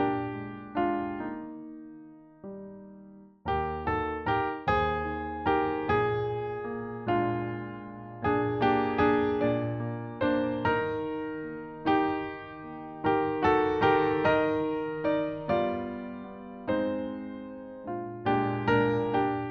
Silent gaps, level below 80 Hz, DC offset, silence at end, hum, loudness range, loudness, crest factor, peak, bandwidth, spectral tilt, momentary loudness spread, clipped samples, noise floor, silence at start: none; -54 dBFS; under 0.1%; 0 s; none; 7 LU; -29 LUFS; 18 dB; -12 dBFS; 6.6 kHz; -8.5 dB/octave; 16 LU; under 0.1%; -51 dBFS; 0 s